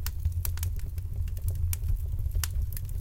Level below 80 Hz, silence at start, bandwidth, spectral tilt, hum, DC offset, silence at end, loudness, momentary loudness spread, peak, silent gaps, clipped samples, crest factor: -32 dBFS; 0 s; 17 kHz; -4 dB/octave; none; under 0.1%; 0 s; -33 LUFS; 4 LU; -10 dBFS; none; under 0.1%; 20 dB